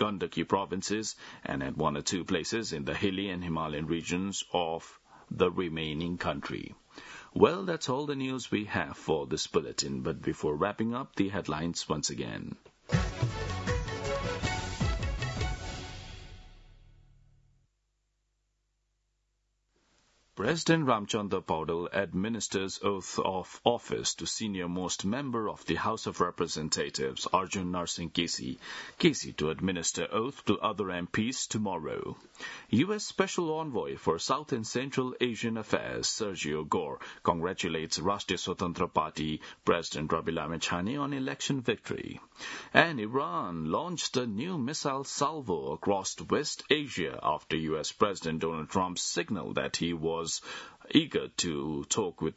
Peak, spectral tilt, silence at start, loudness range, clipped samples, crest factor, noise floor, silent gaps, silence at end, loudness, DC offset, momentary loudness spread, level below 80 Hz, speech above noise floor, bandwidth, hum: -2 dBFS; -4 dB/octave; 0 s; 3 LU; under 0.1%; 30 dB; -78 dBFS; none; 0.05 s; -32 LUFS; under 0.1%; 7 LU; -50 dBFS; 46 dB; 8.2 kHz; none